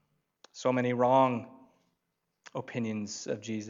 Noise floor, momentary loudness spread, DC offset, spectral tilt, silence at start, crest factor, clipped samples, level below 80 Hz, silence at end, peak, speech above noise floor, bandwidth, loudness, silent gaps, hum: -82 dBFS; 16 LU; under 0.1%; -5.5 dB/octave; 0.55 s; 20 dB; under 0.1%; -84 dBFS; 0 s; -12 dBFS; 52 dB; 7.6 kHz; -30 LUFS; none; none